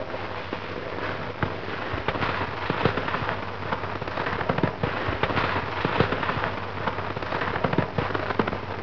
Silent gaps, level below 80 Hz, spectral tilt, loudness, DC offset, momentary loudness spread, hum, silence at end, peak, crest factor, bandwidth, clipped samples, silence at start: none; -46 dBFS; -7 dB/octave; -27 LUFS; 1%; 7 LU; none; 0 s; -6 dBFS; 22 dB; 7 kHz; under 0.1%; 0 s